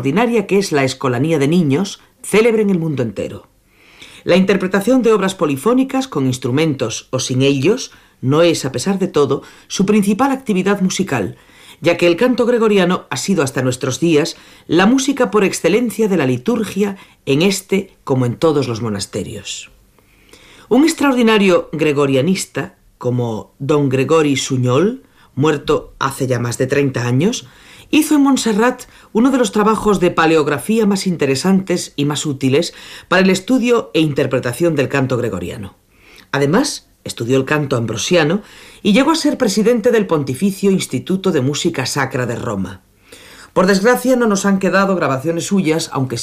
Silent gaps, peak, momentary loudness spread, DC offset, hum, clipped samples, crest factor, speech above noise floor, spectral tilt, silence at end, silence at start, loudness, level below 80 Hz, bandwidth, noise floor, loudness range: none; -2 dBFS; 9 LU; under 0.1%; none; under 0.1%; 14 dB; 35 dB; -5.5 dB/octave; 0 s; 0 s; -16 LUFS; -50 dBFS; 15.5 kHz; -50 dBFS; 3 LU